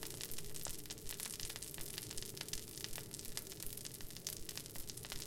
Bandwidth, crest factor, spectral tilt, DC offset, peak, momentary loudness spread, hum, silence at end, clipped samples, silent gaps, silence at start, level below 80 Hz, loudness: 17 kHz; 28 dB; -2 dB/octave; under 0.1%; -18 dBFS; 3 LU; none; 0 s; under 0.1%; none; 0 s; -58 dBFS; -46 LUFS